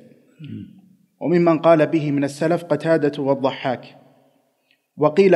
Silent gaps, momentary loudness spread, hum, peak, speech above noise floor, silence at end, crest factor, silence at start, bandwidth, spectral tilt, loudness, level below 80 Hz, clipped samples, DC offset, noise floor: none; 18 LU; none; -2 dBFS; 47 dB; 0 s; 18 dB; 0.4 s; 12 kHz; -7.5 dB/octave; -19 LUFS; -72 dBFS; under 0.1%; under 0.1%; -65 dBFS